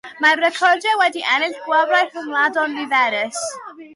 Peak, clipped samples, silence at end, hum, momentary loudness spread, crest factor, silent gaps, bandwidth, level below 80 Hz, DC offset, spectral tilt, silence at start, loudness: -4 dBFS; under 0.1%; 0 s; none; 8 LU; 14 dB; none; 11.5 kHz; -76 dBFS; under 0.1%; -0.5 dB/octave; 0.05 s; -17 LUFS